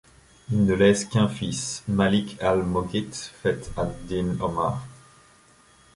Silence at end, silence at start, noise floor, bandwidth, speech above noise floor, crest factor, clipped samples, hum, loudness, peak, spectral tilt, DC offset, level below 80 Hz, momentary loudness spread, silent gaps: 1 s; 0.5 s; -56 dBFS; 11.5 kHz; 32 dB; 18 dB; under 0.1%; none; -25 LUFS; -6 dBFS; -5.5 dB/octave; under 0.1%; -46 dBFS; 10 LU; none